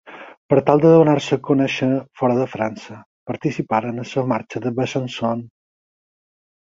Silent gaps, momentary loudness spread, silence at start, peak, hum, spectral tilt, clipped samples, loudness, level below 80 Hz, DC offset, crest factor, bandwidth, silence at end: 0.37-0.49 s, 3.06-3.26 s; 15 LU; 0.05 s; 0 dBFS; none; -7 dB/octave; under 0.1%; -19 LUFS; -60 dBFS; under 0.1%; 20 dB; 7.6 kHz; 1.2 s